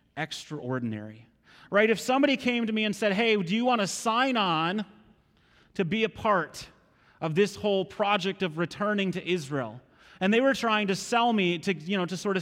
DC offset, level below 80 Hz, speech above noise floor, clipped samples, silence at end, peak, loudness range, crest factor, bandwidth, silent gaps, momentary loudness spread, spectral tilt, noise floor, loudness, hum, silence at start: under 0.1%; -66 dBFS; 36 dB; under 0.1%; 0 s; -10 dBFS; 4 LU; 18 dB; 16 kHz; none; 11 LU; -4.5 dB/octave; -62 dBFS; -27 LUFS; none; 0.15 s